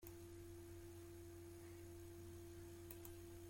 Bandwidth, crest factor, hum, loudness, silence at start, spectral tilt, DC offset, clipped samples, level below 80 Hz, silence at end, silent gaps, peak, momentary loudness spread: 16.5 kHz; 20 dB; none; -58 LUFS; 0 s; -5.5 dB/octave; under 0.1%; under 0.1%; -68 dBFS; 0 s; none; -36 dBFS; 2 LU